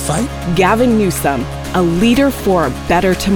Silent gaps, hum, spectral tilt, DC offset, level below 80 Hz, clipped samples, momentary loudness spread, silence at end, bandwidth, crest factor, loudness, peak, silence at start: none; none; -5.5 dB/octave; under 0.1%; -28 dBFS; under 0.1%; 6 LU; 0 s; over 20 kHz; 12 dB; -14 LUFS; -2 dBFS; 0 s